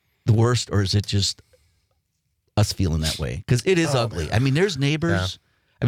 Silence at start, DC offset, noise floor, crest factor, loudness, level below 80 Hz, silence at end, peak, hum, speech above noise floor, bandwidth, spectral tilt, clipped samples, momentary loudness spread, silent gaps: 0.25 s; under 0.1%; -72 dBFS; 14 dB; -22 LUFS; -42 dBFS; 0 s; -8 dBFS; none; 51 dB; 15.5 kHz; -5.5 dB/octave; under 0.1%; 7 LU; none